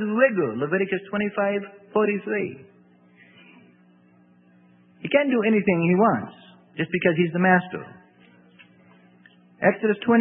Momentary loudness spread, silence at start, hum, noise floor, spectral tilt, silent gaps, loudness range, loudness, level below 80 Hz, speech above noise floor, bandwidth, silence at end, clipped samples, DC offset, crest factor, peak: 13 LU; 0 s; none; -56 dBFS; -11.5 dB/octave; none; 8 LU; -22 LUFS; -68 dBFS; 34 dB; 3.8 kHz; 0 s; under 0.1%; under 0.1%; 20 dB; -4 dBFS